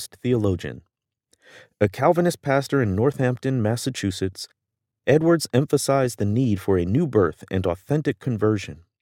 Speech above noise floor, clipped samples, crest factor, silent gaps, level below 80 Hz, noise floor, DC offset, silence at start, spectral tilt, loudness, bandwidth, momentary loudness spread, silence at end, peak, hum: 61 dB; under 0.1%; 18 dB; none; -52 dBFS; -82 dBFS; under 0.1%; 0 s; -6.5 dB/octave; -22 LUFS; 17 kHz; 9 LU; 0.25 s; -4 dBFS; none